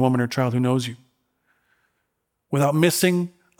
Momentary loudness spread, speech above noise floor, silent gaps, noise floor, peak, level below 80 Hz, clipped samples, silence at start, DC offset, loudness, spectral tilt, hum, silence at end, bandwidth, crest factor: 8 LU; 56 dB; none; -76 dBFS; -6 dBFS; -68 dBFS; under 0.1%; 0 s; under 0.1%; -21 LUFS; -5.5 dB/octave; none; 0.3 s; 18 kHz; 18 dB